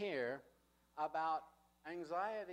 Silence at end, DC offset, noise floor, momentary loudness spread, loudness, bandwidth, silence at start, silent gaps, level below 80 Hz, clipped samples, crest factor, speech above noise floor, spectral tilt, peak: 0 s; under 0.1%; -73 dBFS; 12 LU; -43 LUFS; 15.5 kHz; 0 s; none; -82 dBFS; under 0.1%; 16 dB; 31 dB; -5.5 dB/octave; -28 dBFS